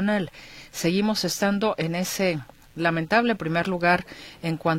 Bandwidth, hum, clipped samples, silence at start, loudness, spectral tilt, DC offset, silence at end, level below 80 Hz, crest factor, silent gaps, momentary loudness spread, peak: 16.5 kHz; none; under 0.1%; 0 s; -24 LUFS; -5 dB/octave; under 0.1%; 0 s; -56 dBFS; 18 dB; none; 13 LU; -6 dBFS